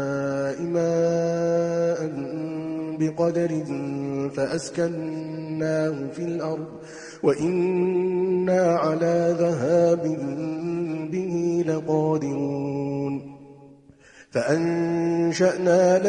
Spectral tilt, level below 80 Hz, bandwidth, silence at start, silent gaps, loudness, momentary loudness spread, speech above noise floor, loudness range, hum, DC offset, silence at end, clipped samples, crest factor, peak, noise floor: -7 dB/octave; -64 dBFS; 10 kHz; 0 s; none; -24 LUFS; 10 LU; 28 dB; 5 LU; none; under 0.1%; 0 s; under 0.1%; 16 dB; -8 dBFS; -51 dBFS